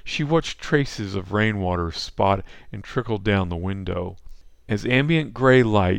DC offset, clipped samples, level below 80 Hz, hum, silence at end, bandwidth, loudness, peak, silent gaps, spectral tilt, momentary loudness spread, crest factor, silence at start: under 0.1%; under 0.1%; -42 dBFS; none; 0 s; 10 kHz; -22 LUFS; -2 dBFS; none; -6.5 dB/octave; 12 LU; 20 dB; 0.05 s